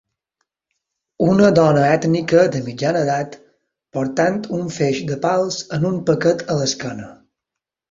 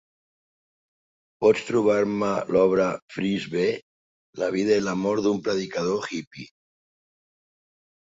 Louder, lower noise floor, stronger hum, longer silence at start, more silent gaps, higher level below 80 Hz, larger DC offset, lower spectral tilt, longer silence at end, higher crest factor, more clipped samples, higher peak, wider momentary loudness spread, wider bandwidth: first, -18 LUFS vs -24 LUFS; second, -84 dBFS vs under -90 dBFS; neither; second, 1.2 s vs 1.4 s; second, none vs 3.02-3.08 s, 3.82-4.33 s, 6.27-6.31 s; first, -54 dBFS vs -62 dBFS; neither; about the same, -6 dB/octave vs -5.5 dB/octave; second, 0.75 s vs 1.75 s; about the same, 18 dB vs 20 dB; neither; first, -2 dBFS vs -6 dBFS; about the same, 11 LU vs 12 LU; about the same, 7.8 kHz vs 7.8 kHz